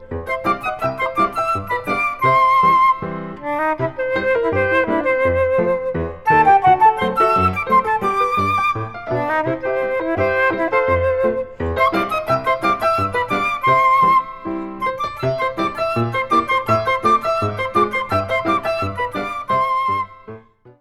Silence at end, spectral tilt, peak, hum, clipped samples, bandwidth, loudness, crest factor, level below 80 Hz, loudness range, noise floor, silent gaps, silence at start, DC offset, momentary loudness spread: 0.1 s; -6.5 dB/octave; -2 dBFS; none; under 0.1%; 15 kHz; -18 LUFS; 16 dB; -44 dBFS; 3 LU; -40 dBFS; none; 0 s; under 0.1%; 9 LU